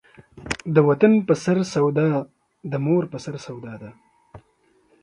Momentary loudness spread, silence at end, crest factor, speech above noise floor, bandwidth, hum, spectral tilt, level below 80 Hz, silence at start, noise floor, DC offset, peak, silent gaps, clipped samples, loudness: 21 LU; 0.65 s; 20 dB; 42 dB; 10.5 kHz; none; -7 dB/octave; -56 dBFS; 0.35 s; -62 dBFS; under 0.1%; -2 dBFS; none; under 0.1%; -21 LUFS